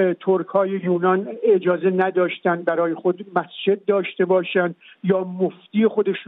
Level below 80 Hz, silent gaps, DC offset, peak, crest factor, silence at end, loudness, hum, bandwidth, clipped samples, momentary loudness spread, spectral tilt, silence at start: -78 dBFS; none; under 0.1%; -6 dBFS; 14 dB; 0.05 s; -21 LUFS; none; 4 kHz; under 0.1%; 5 LU; -10.5 dB/octave; 0 s